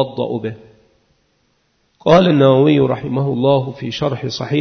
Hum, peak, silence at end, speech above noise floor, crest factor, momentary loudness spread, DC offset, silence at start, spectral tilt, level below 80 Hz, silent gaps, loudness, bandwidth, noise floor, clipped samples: none; 0 dBFS; 0 s; 48 dB; 16 dB; 12 LU; under 0.1%; 0 s; -7.5 dB/octave; -50 dBFS; none; -15 LUFS; 6.6 kHz; -62 dBFS; under 0.1%